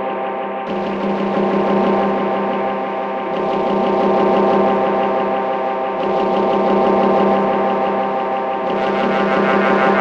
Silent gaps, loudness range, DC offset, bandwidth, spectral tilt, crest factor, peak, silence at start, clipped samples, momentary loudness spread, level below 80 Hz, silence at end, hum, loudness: none; 2 LU; under 0.1%; 7.4 kHz; -7.5 dB/octave; 14 dB; -4 dBFS; 0 s; under 0.1%; 7 LU; -52 dBFS; 0 s; none; -17 LUFS